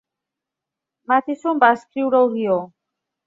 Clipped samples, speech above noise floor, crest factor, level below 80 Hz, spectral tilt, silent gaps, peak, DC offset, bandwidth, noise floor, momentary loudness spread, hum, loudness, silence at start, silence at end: under 0.1%; 67 dB; 18 dB; -72 dBFS; -6.5 dB/octave; none; -2 dBFS; under 0.1%; 7.6 kHz; -85 dBFS; 7 LU; none; -19 LUFS; 1.1 s; 0.6 s